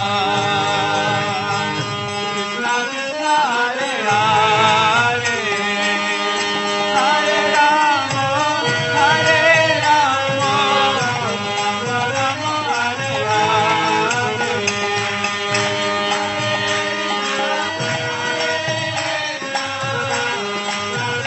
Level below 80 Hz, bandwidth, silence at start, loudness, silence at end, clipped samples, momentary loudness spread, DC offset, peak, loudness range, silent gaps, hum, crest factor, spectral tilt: -58 dBFS; 8.4 kHz; 0 s; -17 LUFS; 0 s; under 0.1%; 7 LU; under 0.1%; -2 dBFS; 5 LU; none; none; 16 dB; -3 dB/octave